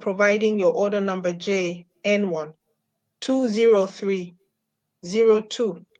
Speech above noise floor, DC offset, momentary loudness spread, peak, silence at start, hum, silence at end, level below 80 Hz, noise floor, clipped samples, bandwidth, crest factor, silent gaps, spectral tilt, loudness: 57 dB; under 0.1%; 11 LU; -6 dBFS; 0 s; none; 0.2 s; -74 dBFS; -79 dBFS; under 0.1%; 9.2 kHz; 16 dB; none; -5.5 dB/octave; -22 LUFS